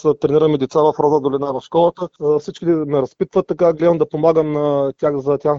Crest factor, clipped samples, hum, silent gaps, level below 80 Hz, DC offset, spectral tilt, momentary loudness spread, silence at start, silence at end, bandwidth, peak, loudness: 14 dB; under 0.1%; none; none; -54 dBFS; under 0.1%; -8 dB/octave; 5 LU; 0.05 s; 0 s; 7.4 kHz; -2 dBFS; -17 LUFS